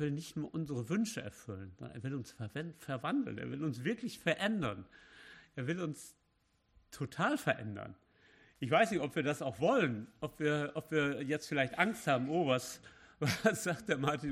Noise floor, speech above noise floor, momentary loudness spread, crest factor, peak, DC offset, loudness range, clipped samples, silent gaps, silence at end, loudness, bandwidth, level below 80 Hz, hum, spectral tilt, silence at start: -76 dBFS; 40 dB; 16 LU; 22 dB; -14 dBFS; under 0.1%; 6 LU; under 0.1%; none; 0 s; -36 LUFS; 14.5 kHz; -70 dBFS; none; -5.5 dB/octave; 0 s